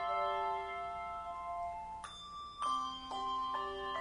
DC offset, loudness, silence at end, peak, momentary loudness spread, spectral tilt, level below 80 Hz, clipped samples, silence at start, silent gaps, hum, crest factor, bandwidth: under 0.1%; -40 LUFS; 0 s; -26 dBFS; 11 LU; -3 dB/octave; -62 dBFS; under 0.1%; 0 s; none; none; 14 dB; 10.5 kHz